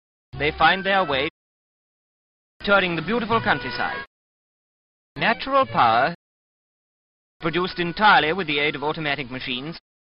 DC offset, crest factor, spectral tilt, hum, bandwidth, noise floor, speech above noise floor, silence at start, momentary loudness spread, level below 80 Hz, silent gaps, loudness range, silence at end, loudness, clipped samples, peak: under 0.1%; 20 dB; -8.5 dB/octave; none; 5.6 kHz; under -90 dBFS; over 69 dB; 0.35 s; 12 LU; -50 dBFS; 1.30-2.60 s, 4.07-5.15 s, 6.15-7.40 s; 3 LU; 0.3 s; -21 LUFS; under 0.1%; -4 dBFS